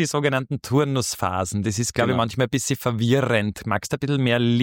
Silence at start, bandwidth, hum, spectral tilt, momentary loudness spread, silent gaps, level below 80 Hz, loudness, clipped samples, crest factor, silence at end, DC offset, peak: 0 s; 17 kHz; none; -5 dB/octave; 5 LU; none; -52 dBFS; -22 LUFS; under 0.1%; 16 dB; 0 s; under 0.1%; -6 dBFS